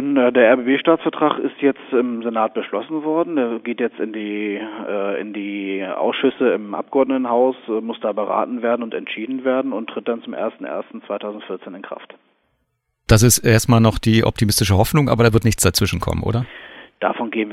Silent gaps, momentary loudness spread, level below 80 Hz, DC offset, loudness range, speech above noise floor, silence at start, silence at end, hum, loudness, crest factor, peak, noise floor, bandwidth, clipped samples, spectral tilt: none; 13 LU; -40 dBFS; under 0.1%; 9 LU; 53 dB; 0 s; 0 s; none; -19 LUFS; 18 dB; 0 dBFS; -71 dBFS; 16.5 kHz; under 0.1%; -5 dB/octave